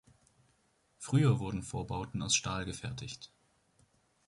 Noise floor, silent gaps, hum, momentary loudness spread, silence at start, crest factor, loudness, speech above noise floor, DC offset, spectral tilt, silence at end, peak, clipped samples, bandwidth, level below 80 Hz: -73 dBFS; none; none; 18 LU; 1 s; 22 dB; -33 LUFS; 39 dB; under 0.1%; -4.5 dB/octave; 1 s; -14 dBFS; under 0.1%; 11.5 kHz; -56 dBFS